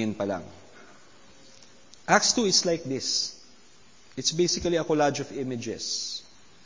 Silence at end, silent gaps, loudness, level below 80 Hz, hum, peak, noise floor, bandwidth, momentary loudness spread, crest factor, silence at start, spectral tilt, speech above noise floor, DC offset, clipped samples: 0.45 s; none; -26 LUFS; -58 dBFS; none; -4 dBFS; -57 dBFS; 7.6 kHz; 14 LU; 24 dB; 0 s; -2.5 dB/octave; 30 dB; 0.2%; under 0.1%